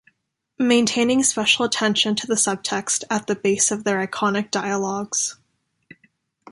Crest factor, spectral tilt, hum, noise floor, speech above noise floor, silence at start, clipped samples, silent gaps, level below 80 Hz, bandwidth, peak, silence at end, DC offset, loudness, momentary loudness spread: 18 dB; -2.5 dB/octave; none; -70 dBFS; 49 dB; 0.6 s; under 0.1%; none; -64 dBFS; 11.5 kHz; -4 dBFS; 1.15 s; under 0.1%; -20 LUFS; 6 LU